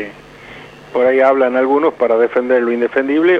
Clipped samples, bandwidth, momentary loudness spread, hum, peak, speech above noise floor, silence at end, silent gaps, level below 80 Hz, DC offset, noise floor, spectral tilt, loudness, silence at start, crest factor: under 0.1%; 6.6 kHz; 14 LU; none; 0 dBFS; 23 dB; 0 s; none; -56 dBFS; under 0.1%; -36 dBFS; -6.5 dB/octave; -14 LUFS; 0 s; 14 dB